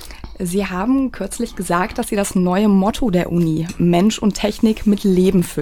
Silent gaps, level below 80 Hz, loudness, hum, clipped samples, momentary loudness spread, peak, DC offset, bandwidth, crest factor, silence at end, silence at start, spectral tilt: none; -36 dBFS; -17 LUFS; none; under 0.1%; 8 LU; -2 dBFS; under 0.1%; 17 kHz; 16 dB; 0 s; 0 s; -6 dB/octave